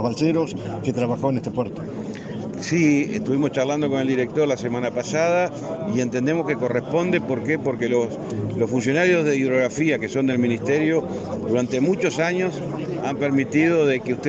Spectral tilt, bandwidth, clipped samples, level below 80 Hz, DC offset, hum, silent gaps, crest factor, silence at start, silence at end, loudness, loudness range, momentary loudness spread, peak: -6 dB/octave; 8.2 kHz; under 0.1%; -58 dBFS; under 0.1%; none; none; 16 dB; 0 s; 0 s; -22 LUFS; 2 LU; 9 LU; -6 dBFS